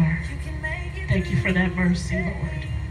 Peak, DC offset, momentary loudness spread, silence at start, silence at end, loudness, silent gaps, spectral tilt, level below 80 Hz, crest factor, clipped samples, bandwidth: -8 dBFS; under 0.1%; 9 LU; 0 s; 0 s; -25 LUFS; none; -7 dB/octave; -32 dBFS; 16 dB; under 0.1%; 11 kHz